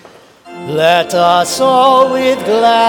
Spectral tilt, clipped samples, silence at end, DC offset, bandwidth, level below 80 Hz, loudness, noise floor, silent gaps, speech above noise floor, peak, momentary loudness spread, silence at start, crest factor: -3.5 dB/octave; under 0.1%; 0 s; under 0.1%; 18.5 kHz; -54 dBFS; -11 LUFS; -39 dBFS; none; 29 dB; 0 dBFS; 5 LU; 0.45 s; 12 dB